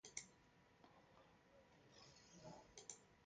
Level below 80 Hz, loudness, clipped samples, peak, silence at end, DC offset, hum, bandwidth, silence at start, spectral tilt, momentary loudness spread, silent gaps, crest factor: -84 dBFS; -61 LUFS; under 0.1%; -32 dBFS; 0 s; under 0.1%; none; 9 kHz; 0.05 s; -2 dB/octave; 11 LU; none; 32 dB